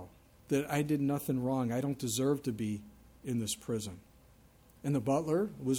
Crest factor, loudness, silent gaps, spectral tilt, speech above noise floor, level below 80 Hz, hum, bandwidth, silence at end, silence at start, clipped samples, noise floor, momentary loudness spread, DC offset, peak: 16 dB; -34 LUFS; none; -5.5 dB/octave; 28 dB; -64 dBFS; none; 19 kHz; 0 s; 0 s; under 0.1%; -61 dBFS; 11 LU; under 0.1%; -18 dBFS